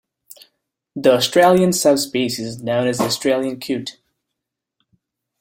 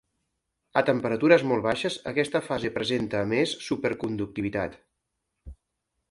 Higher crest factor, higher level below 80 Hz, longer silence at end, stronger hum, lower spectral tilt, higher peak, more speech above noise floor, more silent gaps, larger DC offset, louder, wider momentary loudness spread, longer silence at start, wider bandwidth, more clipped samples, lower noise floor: about the same, 18 dB vs 22 dB; about the same, -58 dBFS vs -56 dBFS; first, 1.5 s vs 0.6 s; neither; second, -4 dB/octave vs -5.5 dB/octave; first, -2 dBFS vs -6 dBFS; first, 64 dB vs 55 dB; neither; neither; first, -17 LUFS vs -26 LUFS; about the same, 12 LU vs 10 LU; first, 0.95 s vs 0.75 s; first, 16.5 kHz vs 11.5 kHz; neither; about the same, -81 dBFS vs -81 dBFS